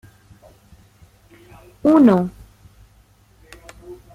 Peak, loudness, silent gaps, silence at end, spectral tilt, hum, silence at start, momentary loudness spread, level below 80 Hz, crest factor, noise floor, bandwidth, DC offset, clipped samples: -2 dBFS; -16 LUFS; none; 0.2 s; -8.5 dB/octave; none; 1.85 s; 29 LU; -52 dBFS; 18 dB; -53 dBFS; 12.5 kHz; under 0.1%; under 0.1%